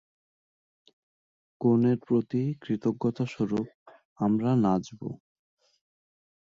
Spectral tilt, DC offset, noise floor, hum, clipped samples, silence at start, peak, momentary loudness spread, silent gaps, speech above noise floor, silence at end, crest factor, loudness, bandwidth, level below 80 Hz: -9 dB/octave; under 0.1%; under -90 dBFS; none; under 0.1%; 1.6 s; -12 dBFS; 15 LU; 3.74-3.86 s, 4.05-4.16 s; over 64 dB; 1.3 s; 18 dB; -27 LUFS; 7.4 kHz; -64 dBFS